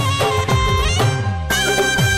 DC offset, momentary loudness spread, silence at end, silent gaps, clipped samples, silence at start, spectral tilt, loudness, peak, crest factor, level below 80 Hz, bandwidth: under 0.1%; 3 LU; 0 s; none; under 0.1%; 0 s; -4 dB/octave; -17 LUFS; -8 dBFS; 10 dB; -28 dBFS; 16.5 kHz